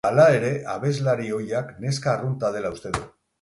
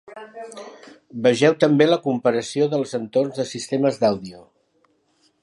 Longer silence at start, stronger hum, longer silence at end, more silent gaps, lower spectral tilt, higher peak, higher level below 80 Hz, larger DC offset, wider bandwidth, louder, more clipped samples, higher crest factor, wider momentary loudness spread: about the same, 0.05 s vs 0.1 s; neither; second, 0.35 s vs 1 s; neither; about the same, -6 dB/octave vs -5.5 dB/octave; about the same, -4 dBFS vs -2 dBFS; first, -52 dBFS vs -66 dBFS; neither; about the same, 11.5 kHz vs 11.5 kHz; second, -24 LUFS vs -20 LUFS; neither; about the same, 18 dB vs 20 dB; second, 13 LU vs 21 LU